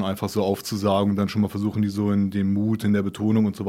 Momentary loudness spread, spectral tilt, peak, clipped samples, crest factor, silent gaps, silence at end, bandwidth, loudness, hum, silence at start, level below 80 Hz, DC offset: 3 LU; -7 dB/octave; -8 dBFS; under 0.1%; 14 dB; none; 0 s; 16 kHz; -23 LUFS; none; 0 s; -58 dBFS; under 0.1%